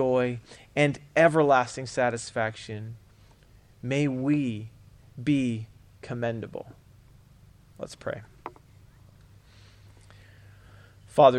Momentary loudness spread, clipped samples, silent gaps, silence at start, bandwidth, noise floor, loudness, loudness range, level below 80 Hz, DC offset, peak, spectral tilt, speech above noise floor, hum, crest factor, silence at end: 23 LU; under 0.1%; none; 0 s; 11 kHz; -56 dBFS; -27 LUFS; 18 LU; -60 dBFS; under 0.1%; -4 dBFS; -6 dB/octave; 29 dB; none; 24 dB; 0 s